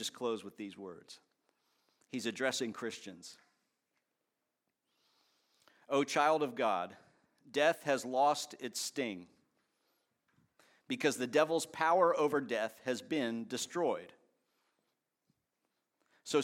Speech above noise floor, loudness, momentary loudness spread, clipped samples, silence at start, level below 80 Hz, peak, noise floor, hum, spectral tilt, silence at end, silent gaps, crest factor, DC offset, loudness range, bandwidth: 52 dB; -34 LUFS; 17 LU; under 0.1%; 0 s; -90 dBFS; -14 dBFS; -87 dBFS; none; -3.5 dB/octave; 0 s; none; 22 dB; under 0.1%; 9 LU; 16.5 kHz